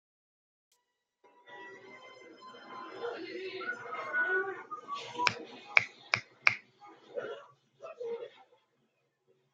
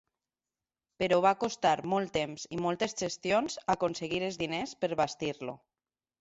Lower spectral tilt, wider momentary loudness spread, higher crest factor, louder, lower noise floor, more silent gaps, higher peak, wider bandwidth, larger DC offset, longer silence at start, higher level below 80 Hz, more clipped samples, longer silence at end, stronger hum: second, -2.5 dB/octave vs -4 dB/octave; first, 23 LU vs 9 LU; first, 36 dB vs 20 dB; second, -34 LUFS vs -31 LUFS; second, -81 dBFS vs under -90 dBFS; neither; first, -2 dBFS vs -12 dBFS; first, 9.2 kHz vs 8 kHz; neither; first, 1.25 s vs 1 s; second, -86 dBFS vs -66 dBFS; neither; first, 1.1 s vs 0.65 s; neither